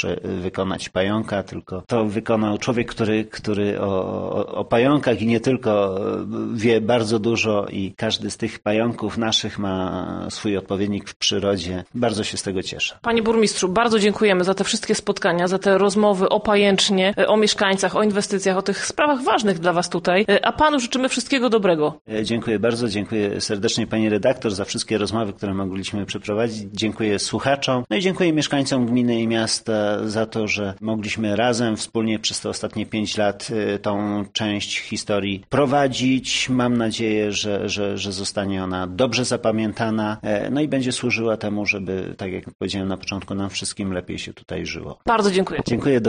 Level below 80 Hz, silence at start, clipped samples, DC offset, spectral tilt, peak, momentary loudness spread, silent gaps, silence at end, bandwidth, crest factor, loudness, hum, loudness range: -52 dBFS; 0 s; under 0.1%; under 0.1%; -4.5 dB/octave; -4 dBFS; 8 LU; 11.16-11.20 s, 22.01-22.05 s, 42.55-42.59 s; 0 s; 10 kHz; 16 dB; -21 LUFS; none; 5 LU